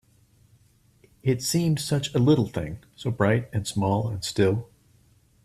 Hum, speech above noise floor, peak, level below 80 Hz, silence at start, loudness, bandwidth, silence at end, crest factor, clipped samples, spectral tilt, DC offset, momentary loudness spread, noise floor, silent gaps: none; 36 dB; -8 dBFS; -54 dBFS; 1.25 s; -25 LUFS; 15.5 kHz; 0.8 s; 18 dB; under 0.1%; -5.5 dB/octave; under 0.1%; 11 LU; -60 dBFS; none